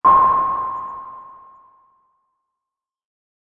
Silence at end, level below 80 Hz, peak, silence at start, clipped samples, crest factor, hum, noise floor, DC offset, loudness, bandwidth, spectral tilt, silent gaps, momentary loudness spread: 2.2 s; -54 dBFS; -2 dBFS; 0.05 s; under 0.1%; 18 dB; none; -86 dBFS; under 0.1%; -17 LUFS; 3.6 kHz; -8 dB/octave; none; 24 LU